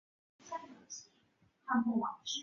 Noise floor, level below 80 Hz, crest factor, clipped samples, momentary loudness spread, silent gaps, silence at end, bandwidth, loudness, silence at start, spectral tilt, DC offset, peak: -72 dBFS; -82 dBFS; 18 dB; under 0.1%; 16 LU; none; 0 s; 7.2 kHz; -37 LUFS; 0.45 s; -2.5 dB/octave; under 0.1%; -22 dBFS